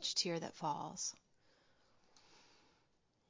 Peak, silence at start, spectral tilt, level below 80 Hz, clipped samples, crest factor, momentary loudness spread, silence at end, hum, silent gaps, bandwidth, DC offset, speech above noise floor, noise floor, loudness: -22 dBFS; 0 s; -2.5 dB/octave; -86 dBFS; under 0.1%; 22 dB; 7 LU; 0.9 s; none; none; 7.8 kHz; under 0.1%; 35 dB; -78 dBFS; -41 LUFS